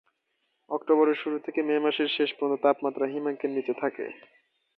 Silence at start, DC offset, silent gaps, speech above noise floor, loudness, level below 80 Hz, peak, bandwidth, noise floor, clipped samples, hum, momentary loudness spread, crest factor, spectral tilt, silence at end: 0.7 s; under 0.1%; none; 50 dB; -27 LUFS; -82 dBFS; -10 dBFS; 4.8 kHz; -76 dBFS; under 0.1%; none; 10 LU; 18 dB; -7.5 dB/octave; 0.6 s